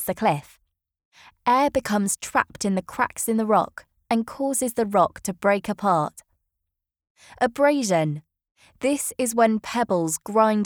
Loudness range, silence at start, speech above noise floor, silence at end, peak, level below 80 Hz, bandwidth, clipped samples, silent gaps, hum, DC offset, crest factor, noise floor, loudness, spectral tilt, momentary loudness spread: 2 LU; 0 s; 60 dB; 0 s; -4 dBFS; -60 dBFS; over 20 kHz; under 0.1%; 1.05-1.12 s, 7.10-7.15 s, 8.51-8.55 s; none; under 0.1%; 20 dB; -83 dBFS; -23 LUFS; -4.5 dB/octave; 6 LU